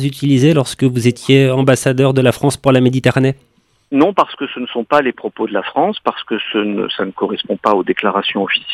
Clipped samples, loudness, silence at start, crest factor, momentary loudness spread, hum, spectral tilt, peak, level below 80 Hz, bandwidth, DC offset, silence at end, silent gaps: under 0.1%; -15 LUFS; 0 s; 14 dB; 8 LU; none; -6 dB/octave; 0 dBFS; -52 dBFS; 13.5 kHz; under 0.1%; 0 s; none